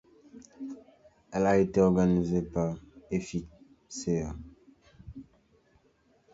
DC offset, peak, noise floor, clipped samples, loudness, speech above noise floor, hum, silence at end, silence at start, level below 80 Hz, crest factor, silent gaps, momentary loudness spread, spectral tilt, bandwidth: under 0.1%; -10 dBFS; -67 dBFS; under 0.1%; -29 LUFS; 39 dB; none; 1.1 s; 0.35 s; -52 dBFS; 20 dB; none; 25 LU; -7 dB/octave; 8 kHz